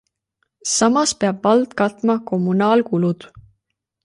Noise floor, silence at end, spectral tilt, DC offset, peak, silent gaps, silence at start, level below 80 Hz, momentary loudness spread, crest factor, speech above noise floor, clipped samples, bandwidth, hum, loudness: -75 dBFS; 0.65 s; -4.5 dB/octave; under 0.1%; -4 dBFS; none; 0.65 s; -60 dBFS; 5 LU; 16 dB; 58 dB; under 0.1%; 11.5 kHz; none; -18 LUFS